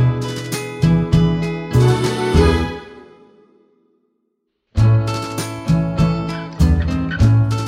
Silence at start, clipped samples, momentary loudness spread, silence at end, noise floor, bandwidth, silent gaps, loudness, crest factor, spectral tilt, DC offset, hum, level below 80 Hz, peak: 0 s; under 0.1%; 10 LU; 0 s; -70 dBFS; 15.5 kHz; none; -17 LUFS; 16 dB; -7 dB/octave; under 0.1%; none; -26 dBFS; -2 dBFS